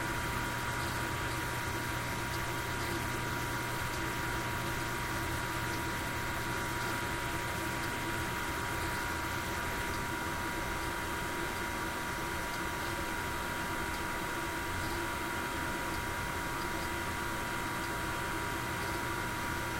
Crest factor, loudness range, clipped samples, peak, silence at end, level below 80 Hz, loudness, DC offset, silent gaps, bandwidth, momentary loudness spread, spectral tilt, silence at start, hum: 14 dB; 1 LU; under 0.1%; -22 dBFS; 0 s; -48 dBFS; -35 LUFS; under 0.1%; none; 16 kHz; 1 LU; -3.5 dB/octave; 0 s; none